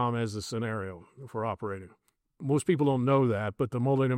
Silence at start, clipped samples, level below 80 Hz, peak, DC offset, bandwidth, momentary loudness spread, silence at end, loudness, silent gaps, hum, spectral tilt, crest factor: 0 s; under 0.1%; -66 dBFS; -12 dBFS; under 0.1%; 14 kHz; 15 LU; 0 s; -29 LUFS; none; none; -7 dB/octave; 16 dB